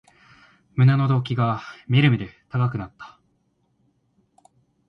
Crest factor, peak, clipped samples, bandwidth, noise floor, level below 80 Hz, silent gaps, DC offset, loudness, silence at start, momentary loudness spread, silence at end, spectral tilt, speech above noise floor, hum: 18 dB; -6 dBFS; under 0.1%; 5.8 kHz; -68 dBFS; -56 dBFS; none; under 0.1%; -22 LUFS; 0.75 s; 17 LU; 1.8 s; -8.5 dB/octave; 47 dB; none